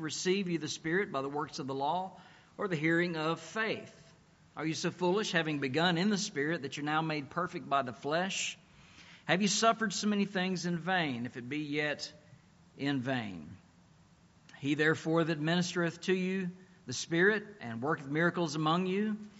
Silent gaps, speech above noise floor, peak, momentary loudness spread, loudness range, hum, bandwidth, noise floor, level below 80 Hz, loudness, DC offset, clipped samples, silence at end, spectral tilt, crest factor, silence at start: none; 30 dB; -12 dBFS; 11 LU; 4 LU; none; 8 kHz; -63 dBFS; -74 dBFS; -33 LUFS; under 0.1%; under 0.1%; 0 s; -4 dB/octave; 22 dB; 0 s